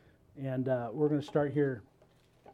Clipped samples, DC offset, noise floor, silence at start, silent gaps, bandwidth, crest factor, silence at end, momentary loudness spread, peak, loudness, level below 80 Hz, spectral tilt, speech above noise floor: under 0.1%; under 0.1%; -65 dBFS; 0.35 s; none; 9.2 kHz; 18 dB; 0 s; 10 LU; -16 dBFS; -33 LUFS; -70 dBFS; -9 dB/octave; 33 dB